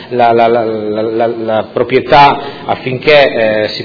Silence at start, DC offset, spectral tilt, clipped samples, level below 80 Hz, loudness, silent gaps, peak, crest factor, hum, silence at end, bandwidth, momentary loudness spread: 0 s; under 0.1%; -6.5 dB/octave; 1%; -42 dBFS; -10 LUFS; none; 0 dBFS; 10 dB; none; 0 s; 5.4 kHz; 10 LU